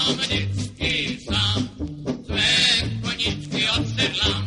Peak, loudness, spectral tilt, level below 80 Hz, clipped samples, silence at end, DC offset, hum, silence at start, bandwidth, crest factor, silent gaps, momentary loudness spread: -6 dBFS; -21 LUFS; -3.5 dB/octave; -38 dBFS; under 0.1%; 0 s; under 0.1%; none; 0 s; 11.5 kHz; 18 dB; none; 12 LU